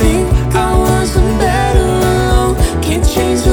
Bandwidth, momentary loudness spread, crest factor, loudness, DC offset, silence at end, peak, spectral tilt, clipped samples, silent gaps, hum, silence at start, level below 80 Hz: 19.5 kHz; 2 LU; 10 dB; -13 LUFS; under 0.1%; 0 s; 0 dBFS; -5.5 dB/octave; under 0.1%; none; none; 0 s; -16 dBFS